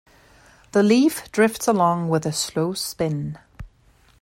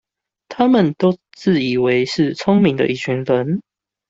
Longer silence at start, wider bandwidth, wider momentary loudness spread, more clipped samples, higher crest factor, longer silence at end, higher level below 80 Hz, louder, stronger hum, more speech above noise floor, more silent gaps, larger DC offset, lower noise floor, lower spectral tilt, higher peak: first, 0.75 s vs 0.5 s; first, 16.5 kHz vs 7.8 kHz; about the same, 8 LU vs 7 LU; neither; about the same, 18 dB vs 16 dB; about the same, 0.55 s vs 0.5 s; about the same, -52 dBFS vs -56 dBFS; second, -21 LUFS vs -17 LUFS; neither; first, 36 dB vs 24 dB; neither; neither; first, -56 dBFS vs -40 dBFS; second, -5 dB/octave vs -7 dB/octave; about the same, -4 dBFS vs -2 dBFS